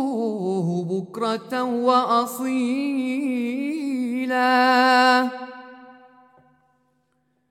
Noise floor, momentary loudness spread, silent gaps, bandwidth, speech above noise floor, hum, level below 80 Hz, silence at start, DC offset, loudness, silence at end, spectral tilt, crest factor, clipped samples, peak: -69 dBFS; 10 LU; none; 15 kHz; 48 dB; none; -80 dBFS; 0 s; under 0.1%; -21 LUFS; 1.6 s; -5 dB/octave; 18 dB; under 0.1%; -4 dBFS